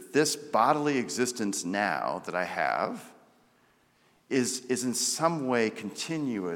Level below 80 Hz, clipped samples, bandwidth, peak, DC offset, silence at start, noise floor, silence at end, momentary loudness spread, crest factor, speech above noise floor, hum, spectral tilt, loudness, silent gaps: -80 dBFS; under 0.1%; 17.5 kHz; -10 dBFS; under 0.1%; 0 s; -65 dBFS; 0 s; 7 LU; 20 dB; 37 dB; none; -3.5 dB/octave; -29 LUFS; none